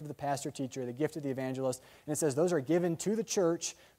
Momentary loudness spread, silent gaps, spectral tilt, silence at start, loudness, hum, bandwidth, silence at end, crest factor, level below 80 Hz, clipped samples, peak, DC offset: 8 LU; none; -5 dB/octave; 0 s; -33 LUFS; none; 16 kHz; 0.25 s; 16 dB; -72 dBFS; under 0.1%; -18 dBFS; under 0.1%